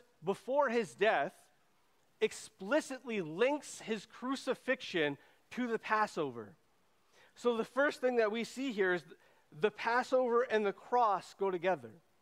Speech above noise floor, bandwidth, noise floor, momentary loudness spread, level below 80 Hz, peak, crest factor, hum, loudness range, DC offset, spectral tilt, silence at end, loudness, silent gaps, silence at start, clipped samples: 40 dB; 15 kHz; -74 dBFS; 9 LU; -84 dBFS; -16 dBFS; 20 dB; none; 4 LU; under 0.1%; -4.5 dB/octave; 0.3 s; -35 LUFS; none; 0.2 s; under 0.1%